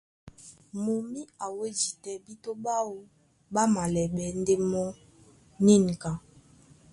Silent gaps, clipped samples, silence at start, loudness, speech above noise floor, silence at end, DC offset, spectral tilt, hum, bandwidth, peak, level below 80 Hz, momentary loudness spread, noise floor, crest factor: none; under 0.1%; 0.25 s; -28 LUFS; 30 dB; 0.75 s; under 0.1%; -5.5 dB/octave; none; 11.5 kHz; -8 dBFS; -58 dBFS; 17 LU; -57 dBFS; 20 dB